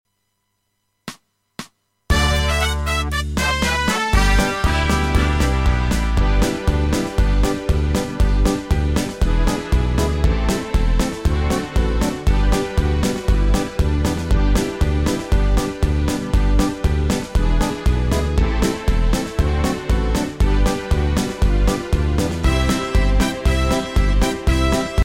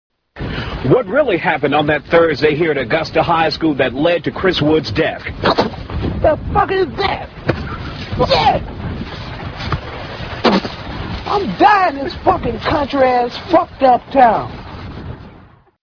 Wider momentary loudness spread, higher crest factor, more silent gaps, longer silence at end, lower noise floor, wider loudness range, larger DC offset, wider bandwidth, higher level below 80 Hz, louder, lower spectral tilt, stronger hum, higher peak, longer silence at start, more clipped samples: second, 3 LU vs 14 LU; about the same, 14 dB vs 16 dB; neither; second, 0 s vs 0.5 s; first, -71 dBFS vs -43 dBFS; about the same, 2 LU vs 4 LU; neither; first, 16.5 kHz vs 5.4 kHz; first, -20 dBFS vs -34 dBFS; second, -19 LUFS vs -16 LUFS; second, -5.5 dB/octave vs -7 dB/octave; neither; second, -4 dBFS vs 0 dBFS; first, 1.05 s vs 0.35 s; neither